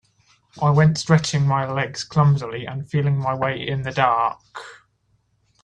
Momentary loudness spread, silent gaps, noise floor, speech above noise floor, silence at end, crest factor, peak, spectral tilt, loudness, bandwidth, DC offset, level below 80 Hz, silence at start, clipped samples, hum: 12 LU; none; -65 dBFS; 45 dB; 0.9 s; 20 dB; -2 dBFS; -6 dB/octave; -20 LUFS; 9.6 kHz; under 0.1%; -54 dBFS; 0.55 s; under 0.1%; none